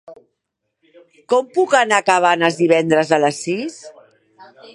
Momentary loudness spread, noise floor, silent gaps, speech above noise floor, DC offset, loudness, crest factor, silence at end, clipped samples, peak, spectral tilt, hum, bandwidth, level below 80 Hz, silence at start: 9 LU; -76 dBFS; none; 60 dB; under 0.1%; -16 LUFS; 18 dB; 0.3 s; under 0.1%; 0 dBFS; -4 dB/octave; none; 11.5 kHz; -70 dBFS; 0.1 s